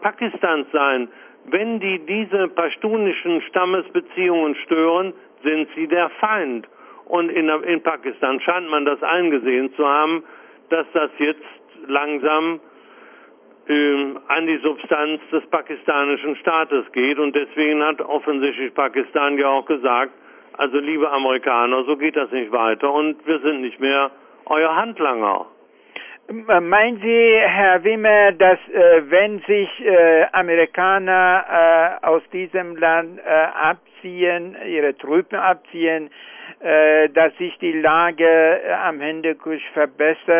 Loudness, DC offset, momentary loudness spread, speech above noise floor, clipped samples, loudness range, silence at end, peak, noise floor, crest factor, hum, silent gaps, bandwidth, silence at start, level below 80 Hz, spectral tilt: -18 LUFS; under 0.1%; 10 LU; 30 dB; under 0.1%; 7 LU; 0 s; -4 dBFS; -48 dBFS; 14 dB; none; none; 3.5 kHz; 0 s; -66 dBFS; -8 dB/octave